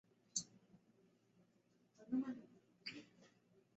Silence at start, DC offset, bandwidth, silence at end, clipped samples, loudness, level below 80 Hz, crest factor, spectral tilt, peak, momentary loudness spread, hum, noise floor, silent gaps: 0.35 s; under 0.1%; 7.6 kHz; 0.5 s; under 0.1%; -47 LUFS; -90 dBFS; 24 dB; -3.5 dB/octave; -26 dBFS; 23 LU; none; -77 dBFS; none